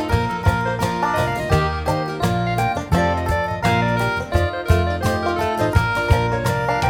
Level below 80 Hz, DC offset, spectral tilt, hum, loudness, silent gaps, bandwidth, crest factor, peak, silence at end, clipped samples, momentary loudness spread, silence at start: -30 dBFS; under 0.1%; -6 dB/octave; none; -20 LUFS; none; 17.5 kHz; 16 dB; -2 dBFS; 0 s; under 0.1%; 3 LU; 0 s